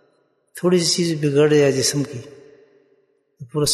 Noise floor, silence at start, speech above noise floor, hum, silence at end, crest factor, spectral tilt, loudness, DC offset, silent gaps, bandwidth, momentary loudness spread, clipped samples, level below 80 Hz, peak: -63 dBFS; 0.55 s; 45 dB; none; 0 s; 16 dB; -4.5 dB/octave; -18 LUFS; under 0.1%; none; 12.5 kHz; 14 LU; under 0.1%; -56 dBFS; -4 dBFS